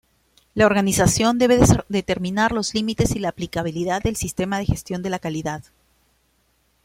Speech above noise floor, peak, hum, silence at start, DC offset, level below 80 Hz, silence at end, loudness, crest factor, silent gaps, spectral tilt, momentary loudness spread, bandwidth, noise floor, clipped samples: 44 dB; -2 dBFS; none; 0.55 s; under 0.1%; -38 dBFS; 1.25 s; -21 LUFS; 20 dB; none; -5 dB/octave; 10 LU; 16.5 kHz; -65 dBFS; under 0.1%